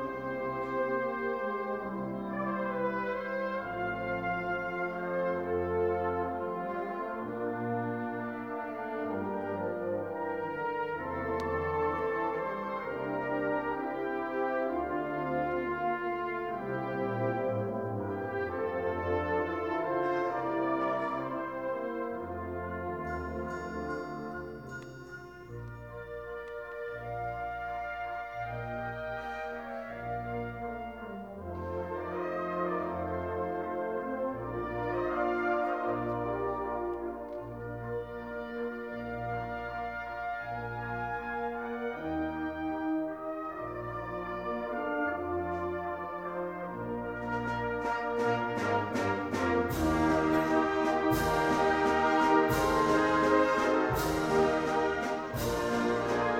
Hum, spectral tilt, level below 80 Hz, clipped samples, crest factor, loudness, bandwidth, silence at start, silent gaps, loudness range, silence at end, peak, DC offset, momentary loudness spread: none; -6 dB/octave; -54 dBFS; under 0.1%; 20 dB; -33 LUFS; 18.5 kHz; 0 s; none; 11 LU; 0 s; -12 dBFS; under 0.1%; 11 LU